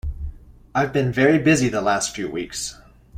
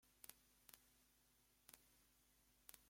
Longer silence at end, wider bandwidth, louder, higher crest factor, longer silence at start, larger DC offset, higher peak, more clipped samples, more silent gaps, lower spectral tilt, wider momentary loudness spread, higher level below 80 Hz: about the same, 0 s vs 0 s; about the same, 16 kHz vs 16.5 kHz; first, -21 LUFS vs -66 LUFS; second, 18 dB vs 40 dB; about the same, 0.05 s vs 0 s; neither; first, -4 dBFS vs -30 dBFS; neither; neither; first, -5 dB/octave vs -1 dB/octave; first, 15 LU vs 5 LU; first, -38 dBFS vs -86 dBFS